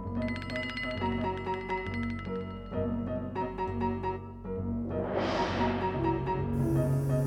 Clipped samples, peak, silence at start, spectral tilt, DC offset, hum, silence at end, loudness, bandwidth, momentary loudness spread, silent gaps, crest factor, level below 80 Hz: under 0.1%; -16 dBFS; 0 s; -7.5 dB/octave; under 0.1%; none; 0 s; -32 LUFS; 16 kHz; 7 LU; none; 16 dB; -46 dBFS